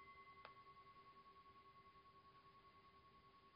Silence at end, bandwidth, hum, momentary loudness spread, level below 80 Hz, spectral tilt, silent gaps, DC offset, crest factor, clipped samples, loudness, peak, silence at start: 0 s; 5.2 kHz; none; 6 LU; -84 dBFS; -2 dB/octave; none; under 0.1%; 26 dB; under 0.1%; -66 LUFS; -40 dBFS; 0 s